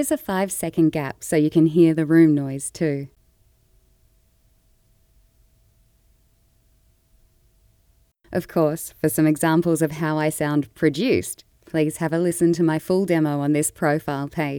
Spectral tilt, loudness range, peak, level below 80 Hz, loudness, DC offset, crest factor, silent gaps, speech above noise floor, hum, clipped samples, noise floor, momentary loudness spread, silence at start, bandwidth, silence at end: -6 dB/octave; 10 LU; -4 dBFS; -56 dBFS; -21 LUFS; under 0.1%; 18 dB; none; 41 dB; none; under 0.1%; -61 dBFS; 11 LU; 0 s; 19 kHz; 0 s